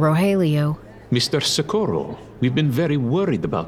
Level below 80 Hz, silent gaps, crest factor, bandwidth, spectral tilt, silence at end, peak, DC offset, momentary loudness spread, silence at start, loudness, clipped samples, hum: -50 dBFS; none; 14 dB; 15.5 kHz; -5.5 dB/octave; 0 s; -6 dBFS; under 0.1%; 7 LU; 0 s; -20 LUFS; under 0.1%; none